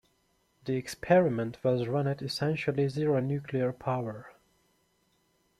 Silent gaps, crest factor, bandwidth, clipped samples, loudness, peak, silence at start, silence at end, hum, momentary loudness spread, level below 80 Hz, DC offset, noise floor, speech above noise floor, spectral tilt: none; 22 dB; 14 kHz; under 0.1%; -30 LUFS; -10 dBFS; 0.65 s; 1.3 s; none; 10 LU; -66 dBFS; under 0.1%; -72 dBFS; 43 dB; -7 dB/octave